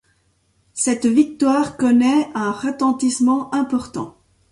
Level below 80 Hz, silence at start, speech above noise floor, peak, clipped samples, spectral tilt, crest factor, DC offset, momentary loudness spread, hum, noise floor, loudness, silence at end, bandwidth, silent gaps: -56 dBFS; 0.75 s; 45 dB; -4 dBFS; under 0.1%; -4 dB/octave; 14 dB; under 0.1%; 11 LU; none; -62 dBFS; -18 LUFS; 0.4 s; 11.5 kHz; none